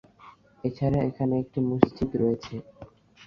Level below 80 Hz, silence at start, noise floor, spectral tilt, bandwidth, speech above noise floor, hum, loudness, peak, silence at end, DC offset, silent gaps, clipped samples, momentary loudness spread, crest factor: -52 dBFS; 0.25 s; -53 dBFS; -9 dB/octave; 6.8 kHz; 27 dB; none; -27 LUFS; -2 dBFS; 0 s; under 0.1%; none; under 0.1%; 10 LU; 26 dB